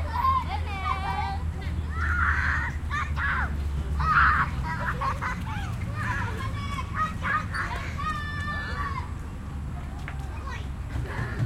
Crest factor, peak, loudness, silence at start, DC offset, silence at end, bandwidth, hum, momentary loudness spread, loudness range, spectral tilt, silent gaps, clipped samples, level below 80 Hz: 20 dB; -8 dBFS; -28 LUFS; 0 s; under 0.1%; 0 s; 15 kHz; none; 11 LU; 7 LU; -6 dB/octave; none; under 0.1%; -34 dBFS